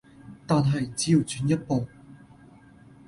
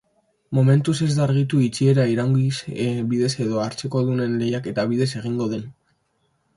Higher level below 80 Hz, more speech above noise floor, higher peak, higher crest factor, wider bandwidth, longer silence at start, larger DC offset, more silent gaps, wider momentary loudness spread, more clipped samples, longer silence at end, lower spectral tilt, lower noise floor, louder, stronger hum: about the same, -56 dBFS vs -58 dBFS; second, 28 dB vs 48 dB; second, -10 dBFS vs -6 dBFS; about the same, 18 dB vs 16 dB; about the same, 11.5 kHz vs 11.5 kHz; second, 0.25 s vs 0.5 s; neither; neither; about the same, 9 LU vs 8 LU; neither; about the same, 0.9 s vs 0.85 s; about the same, -6 dB/octave vs -7 dB/octave; second, -52 dBFS vs -68 dBFS; second, -25 LUFS vs -21 LUFS; neither